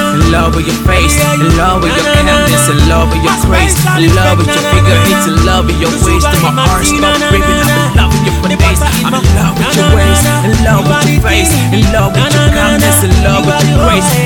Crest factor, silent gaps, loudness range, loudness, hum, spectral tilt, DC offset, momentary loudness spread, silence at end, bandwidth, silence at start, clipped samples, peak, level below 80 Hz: 8 dB; none; 1 LU; -8 LUFS; none; -4.5 dB/octave; under 0.1%; 3 LU; 0 s; 18.5 kHz; 0 s; 0.1%; 0 dBFS; -16 dBFS